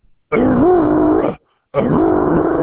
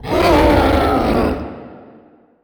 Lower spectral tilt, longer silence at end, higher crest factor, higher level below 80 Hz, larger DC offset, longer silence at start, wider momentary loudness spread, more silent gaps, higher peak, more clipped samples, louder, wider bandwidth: first, -12.5 dB/octave vs -6.5 dB/octave; second, 0 s vs 0.65 s; about the same, 12 dB vs 16 dB; second, -36 dBFS vs -26 dBFS; neither; first, 0.3 s vs 0 s; second, 10 LU vs 17 LU; neither; about the same, -2 dBFS vs 0 dBFS; neither; about the same, -15 LUFS vs -14 LUFS; second, 4 kHz vs over 20 kHz